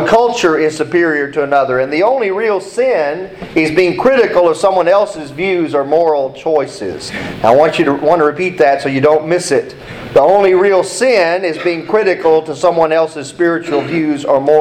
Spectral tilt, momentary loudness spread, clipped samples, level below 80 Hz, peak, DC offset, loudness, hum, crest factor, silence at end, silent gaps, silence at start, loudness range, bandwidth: -5 dB/octave; 7 LU; under 0.1%; -48 dBFS; 0 dBFS; under 0.1%; -13 LUFS; none; 12 dB; 0 s; none; 0 s; 2 LU; 12.5 kHz